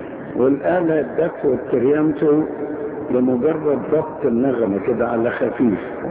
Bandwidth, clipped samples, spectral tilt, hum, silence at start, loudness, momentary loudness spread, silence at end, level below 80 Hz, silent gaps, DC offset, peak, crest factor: 4 kHz; under 0.1%; -12 dB/octave; none; 0 s; -19 LUFS; 6 LU; 0 s; -52 dBFS; none; under 0.1%; -4 dBFS; 14 dB